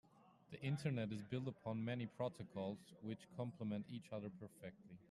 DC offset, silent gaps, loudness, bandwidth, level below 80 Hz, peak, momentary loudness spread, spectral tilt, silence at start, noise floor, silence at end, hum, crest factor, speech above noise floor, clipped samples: under 0.1%; none; -47 LUFS; 12.5 kHz; -80 dBFS; -30 dBFS; 12 LU; -7.5 dB/octave; 0.15 s; -66 dBFS; 0.05 s; none; 18 dB; 20 dB; under 0.1%